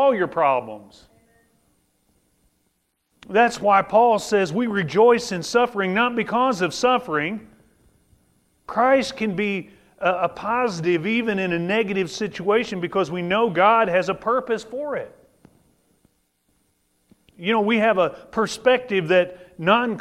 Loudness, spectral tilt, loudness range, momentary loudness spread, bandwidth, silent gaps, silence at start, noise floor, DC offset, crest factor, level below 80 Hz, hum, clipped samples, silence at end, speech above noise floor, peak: -21 LUFS; -5 dB/octave; 7 LU; 10 LU; 13.5 kHz; none; 0 s; -70 dBFS; under 0.1%; 20 dB; -60 dBFS; none; under 0.1%; 0 s; 50 dB; -2 dBFS